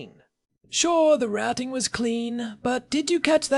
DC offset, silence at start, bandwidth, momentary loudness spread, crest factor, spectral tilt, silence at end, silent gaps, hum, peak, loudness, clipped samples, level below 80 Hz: under 0.1%; 0 s; 12 kHz; 9 LU; 22 dB; -2.5 dB/octave; 0 s; none; none; -2 dBFS; -24 LUFS; under 0.1%; -58 dBFS